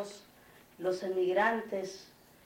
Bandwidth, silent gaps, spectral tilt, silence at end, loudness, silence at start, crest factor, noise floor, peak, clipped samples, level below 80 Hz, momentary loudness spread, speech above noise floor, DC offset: 17 kHz; none; -4.5 dB/octave; 0.4 s; -33 LUFS; 0 s; 18 dB; -59 dBFS; -16 dBFS; under 0.1%; -76 dBFS; 18 LU; 27 dB; under 0.1%